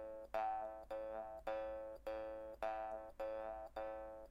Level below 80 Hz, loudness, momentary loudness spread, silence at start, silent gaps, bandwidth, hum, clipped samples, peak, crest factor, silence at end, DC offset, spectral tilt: -66 dBFS; -47 LUFS; 5 LU; 0 s; none; 16 kHz; none; under 0.1%; -30 dBFS; 18 dB; 0 s; under 0.1%; -5.5 dB/octave